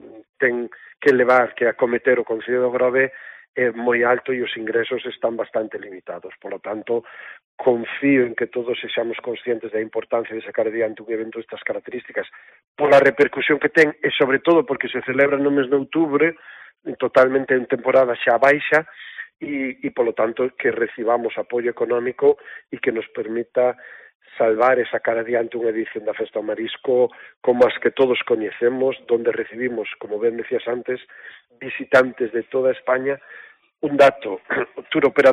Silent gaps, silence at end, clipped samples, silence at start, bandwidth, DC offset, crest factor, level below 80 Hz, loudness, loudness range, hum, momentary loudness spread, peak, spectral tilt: 0.29-0.33 s, 3.49-3.54 s, 7.44-7.58 s, 12.68-12.75 s, 24.15-24.20 s, 27.36-27.41 s; 0 s; under 0.1%; 0.05 s; 9.4 kHz; under 0.1%; 18 dB; -66 dBFS; -20 LUFS; 6 LU; none; 13 LU; -2 dBFS; -6 dB/octave